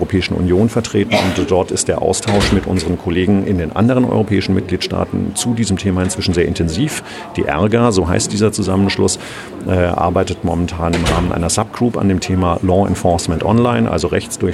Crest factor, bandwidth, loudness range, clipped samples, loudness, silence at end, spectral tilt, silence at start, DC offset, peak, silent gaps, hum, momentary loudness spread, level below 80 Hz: 14 dB; 13.5 kHz; 2 LU; under 0.1%; -16 LUFS; 0 s; -5.5 dB/octave; 0 s; under 0.1%; 0 dBFS; none; none; 5 LU; -34 dBFS